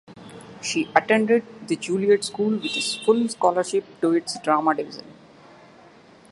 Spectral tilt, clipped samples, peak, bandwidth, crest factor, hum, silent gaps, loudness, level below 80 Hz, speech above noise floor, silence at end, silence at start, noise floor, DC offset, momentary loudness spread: -4 dB/octave; under 0.1%; 0 dBFS; 11.5 kHz; 22 dB; none; none; -22 LUFS; -70 dBFS; 28 dB; 1.2 s; 0.1 s; -50 dBFS; under 0.1%; 13 LU